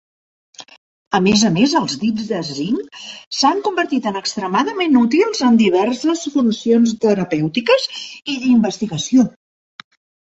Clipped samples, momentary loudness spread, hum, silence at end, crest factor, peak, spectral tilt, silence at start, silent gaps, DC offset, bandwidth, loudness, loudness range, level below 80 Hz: under 0.1%; 9 LU; none; 0.95 s; 16 dB; -2 dBFS; -4.5 dB/octave; 0.6 s; 0.77-1.11 s, 3.27-3.31 s; under 0.1%; 8.2 kHz; -17 LUFS; 3 LU; -58 dBFS